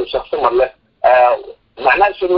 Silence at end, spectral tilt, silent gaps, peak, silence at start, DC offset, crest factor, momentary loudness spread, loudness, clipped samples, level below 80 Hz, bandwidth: 0 s; -7.5 dB/octave; none; 0 dBFS; 0 s; under 0.1%; 14 dB; 9 LU; -14 LUFS; under 0.1%; -46 dBFS; 5.6 kHz